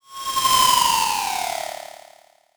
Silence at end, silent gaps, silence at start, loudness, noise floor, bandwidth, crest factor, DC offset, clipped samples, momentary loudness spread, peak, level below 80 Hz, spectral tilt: 0.65 s; none; 0.1 s; -19 LUFS; -52 dBFS; over 20 kHz; 18 dB; under 0.1%; under 0.1%; 18 LU; -4 dBFS; -52 dBFS; 0.5 dB/octave